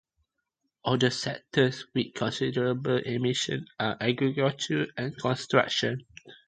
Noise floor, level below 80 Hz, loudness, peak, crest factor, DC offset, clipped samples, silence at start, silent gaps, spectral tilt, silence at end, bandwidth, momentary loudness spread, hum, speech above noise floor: -81 dBFS; -64 dBFS; -28 LUFS; -6 dBFS; 22 dB; under 0.1%; under 0.1%; 0.85 s; none; -5 dB/octave; 0.1 s; 9.4 kHz; 7 LU; none; 53 dB